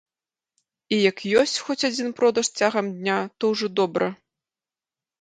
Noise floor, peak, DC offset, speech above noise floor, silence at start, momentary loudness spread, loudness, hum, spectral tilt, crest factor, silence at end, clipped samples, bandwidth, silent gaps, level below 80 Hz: under -90 dBFS; -4 dBFS; under 0.1%; over 68 dB; 0.9 s; 5 LU; -23 LUFS; none; -3.5 dB/octave; 20 dB; 1.05 s; under 0.1%; 11 kHz; none; -70 dBFS